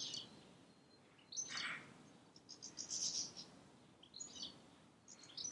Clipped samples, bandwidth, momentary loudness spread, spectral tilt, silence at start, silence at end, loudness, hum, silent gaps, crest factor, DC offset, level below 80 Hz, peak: under 0.1%; 11 kHz; 24 LU; 0 dB/octave; 0 s; 0 s; -46 LUFS; none; none; 22 dB; under 0.1%; -88 dBFS; -30 dBFS